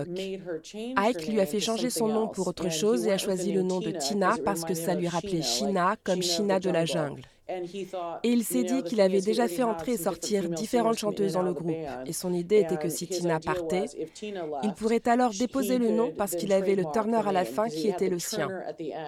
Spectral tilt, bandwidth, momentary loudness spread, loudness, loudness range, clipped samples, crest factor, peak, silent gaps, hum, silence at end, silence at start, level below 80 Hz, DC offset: -4.5 dB/octave; 17 kHz; 10 LU; -28 LUFS; 2 LU; under 0.1%; 20 dB; -8 dBFS; none; none; 0 s; 0 s; -62 dBFS; under 0.1%